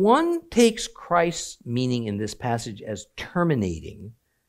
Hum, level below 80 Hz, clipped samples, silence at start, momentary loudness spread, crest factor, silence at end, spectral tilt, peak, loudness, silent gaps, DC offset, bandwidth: none; -52 dBFS; under 0.1%; 0 s; 15 LU; 18 dB; 0.4 s; -5 dB/octave; -6 dBFS; -25 LUFS; none; under 0.1%; 15.5 kHz